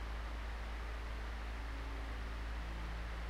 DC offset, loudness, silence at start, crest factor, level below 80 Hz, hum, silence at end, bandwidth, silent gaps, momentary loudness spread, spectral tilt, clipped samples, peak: under 0.1%; -45 LUFS; 0 s; 10 dB; -44 dBFS; none; 0 s; 11.5 kHz; none; 1 LU; -5.5 dB/octave; under 0.1%; -32 dBFS